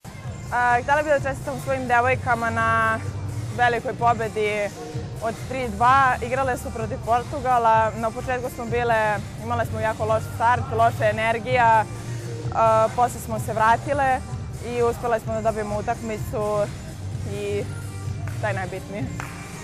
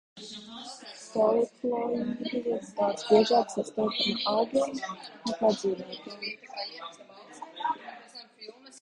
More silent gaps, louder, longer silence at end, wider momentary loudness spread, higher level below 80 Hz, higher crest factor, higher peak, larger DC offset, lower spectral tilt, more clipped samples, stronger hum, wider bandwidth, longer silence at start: neither; first, -23 LUFS vs -29 LUFS; about the same, 0 s vs 0.05 s; second, 12 LU vs 19 LU; first, -42 dBFS vs -70 dBFS; second, 14 dB vs 22 dB; about the same, -8 dBFS vs -8 dBFS; neither; about the same, -5.5 dB/octave vs -4.5 dB/octave; neither; neither; first, 15 kHz vs 11 kHz; about the same, 0.05 s vs 0.15 s